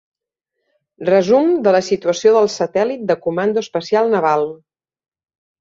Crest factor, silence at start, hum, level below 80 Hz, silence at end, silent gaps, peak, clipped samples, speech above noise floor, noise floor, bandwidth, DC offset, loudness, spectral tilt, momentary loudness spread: 16 dB; 1 s; none; -64 dBFS; 1.05 s; none; -2 dBFS; under 0.1%; 62 dB; -78 dBFS; 7.8 kHz; under 0.1%; -16 LUFS; -5 dB/octave; 6 LU